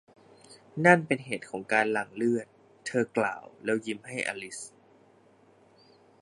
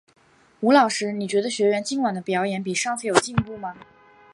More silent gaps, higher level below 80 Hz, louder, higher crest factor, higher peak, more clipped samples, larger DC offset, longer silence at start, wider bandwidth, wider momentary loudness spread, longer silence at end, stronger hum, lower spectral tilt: neither; second, -76 dBFS vs -56 dBFS; second, -28 LUFS vs -22 LUFS; about the same, 26 dB vs 24 dB; second, -4 dBFS vs 0 dBFS; neither; neither; about the same, 0.5 s vs 0.6 s; about the same, 11.5 kHz vs 11.5 kHz; first, 19 LU vs 9 LU; first, 1.55 s vs 0.5 s; neither; about the same, -5.5 dB/octave vs -4.5 dB/octave